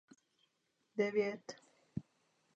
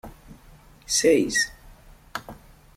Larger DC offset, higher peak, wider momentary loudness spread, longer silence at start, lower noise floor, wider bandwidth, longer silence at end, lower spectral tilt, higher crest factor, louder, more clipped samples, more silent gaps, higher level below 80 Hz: neither; second, -22 dBFS vs -8 dBFS; second, 17 LU vs 23 LU; first, 0.95 s vs 0.05 s; first, -82 dBFS vs -51 dBFS; second, 8 kHz vs 16.5 kHz; first, 0.55 s vs 0.4 s; first, -6 dB/octave vs -2 dB/octave; about the same, 20 dB vs 20 dB; second, -40 LUFS vs -22 LUFS; neither; neither; second, -76 dBFS vs -50 dBFS